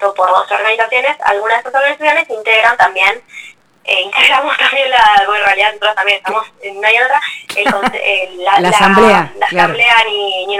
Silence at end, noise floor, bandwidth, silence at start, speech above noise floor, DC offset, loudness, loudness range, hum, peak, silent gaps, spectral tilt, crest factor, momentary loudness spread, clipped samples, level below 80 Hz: 0 s; -36 dBFS; 16.5 kHz; 0 s; 24 dB; under 0.1%; -11 LUFS; 2 LU; none; 0 dBFS; none; -3 dB/octave; 12 dB; 7 LU; 0.1%; -48 dBFS